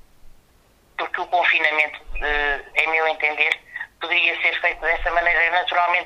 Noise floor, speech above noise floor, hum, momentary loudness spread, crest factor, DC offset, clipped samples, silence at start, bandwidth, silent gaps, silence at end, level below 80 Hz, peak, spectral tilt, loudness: -56 dBFS; 36 dB; none; 11 LU; 20 dB; under 0.1%; under 0.1%; 0.25 s; 13 kHz; none; 0 s; -40 dBFS; -2 dBFS; -2.5 dB/octave; -19 LUFS